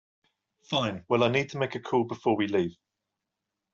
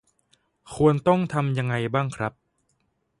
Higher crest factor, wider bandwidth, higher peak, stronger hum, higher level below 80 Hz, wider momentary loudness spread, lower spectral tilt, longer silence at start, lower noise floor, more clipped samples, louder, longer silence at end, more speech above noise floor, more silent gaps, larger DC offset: about the same, 20 dB vs 20 dB; second, 7.4 kHz vs 11.5 kHz; second, -10 dBFS vs -6 dBFS; neither; second, -68 dBFS vs -56 dBFS; second, 7 LU vs 12 LU; second, -4 dB/octave vs -7.5 dB/octave; about the same, 0.7 s vs 0.65 s; first, -86 dBFS vs -72 dBFS; neither; second, -28 LUFS vs -24 LUFS; about the same, 1 s vs 0.9 s; first, 58 dB vs 49 dB; neither; neither